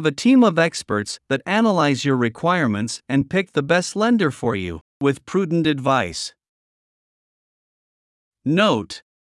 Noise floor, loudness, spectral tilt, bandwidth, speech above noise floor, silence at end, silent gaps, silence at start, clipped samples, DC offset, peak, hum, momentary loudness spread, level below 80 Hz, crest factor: under -90 dBFS; -20 LUFS; -5.5 dB/octave; 12 kHz; over 71 dB; 0.3 s; 4.81-5.00 s, 6.49-8.31 s; 0 s; under 0.1%; under 0.1%; -4 dBFS; none; 9 LU; -58 dBFS; 16 dB